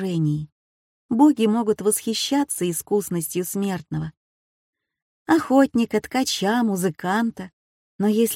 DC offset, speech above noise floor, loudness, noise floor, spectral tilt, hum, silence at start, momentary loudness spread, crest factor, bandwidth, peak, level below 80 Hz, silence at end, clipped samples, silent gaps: under 0.1%; over 69 dB; -22 LUFS; under -90 dBFS; -5 dB/octave; none; 0 s; 12 LU; 16 dB; 16.5 kHz; -6 dBFS; -60 dBFS; 0 s; under 0.1%; 0.52-1.09 s, 4.17-4.73 s, 5.02-5.26 s, 7.53-7.99 s